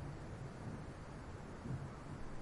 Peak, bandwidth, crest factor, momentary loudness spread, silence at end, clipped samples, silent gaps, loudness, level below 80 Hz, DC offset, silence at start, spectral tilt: -34 dBFS; 11.5 kHz; 14 dB; 4 LU; 0 s; under 0.1%; none; -49 LUFS; -56 dBFS; under 0.1%; 0 s; -7 dB/octave